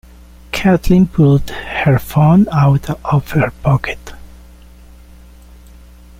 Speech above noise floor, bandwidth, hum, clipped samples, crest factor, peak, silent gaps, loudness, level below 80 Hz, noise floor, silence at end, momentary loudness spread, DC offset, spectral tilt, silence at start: 27 dB; 16 kHz; none; under 0.1%; 14 dB; -2 dBFS; none; -14 LUFS; -32 dBFS; -39 dBFS; 1.95 s; 8 LU; under 0.1%; -8 dB/octave; 0.55 s